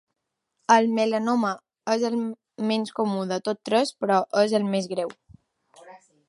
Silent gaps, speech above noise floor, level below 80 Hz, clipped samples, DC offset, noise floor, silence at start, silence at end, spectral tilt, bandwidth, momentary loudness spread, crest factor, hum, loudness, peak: none; 52 dB; -72 dBFS; under 0.1%; under 0.1%; -75 dBFS; 0.7 s; 0.35 s; -5 dB/octave; 11.5 kHz; 11 LU; 20 dB; none; -24 LUFS; -4 dBFS